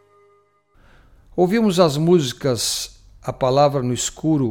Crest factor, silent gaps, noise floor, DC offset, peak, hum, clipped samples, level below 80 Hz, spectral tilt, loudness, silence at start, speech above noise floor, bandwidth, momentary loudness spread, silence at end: 18 dB; none; -58 dBFS; under 0.1%; -2 dBFS; none; under 0.1%; -48 dBFS; -5 dB/octave; -19 LUFS; 1.35 s; 40 dB; 17.5 kHz; 14 LU; 0 s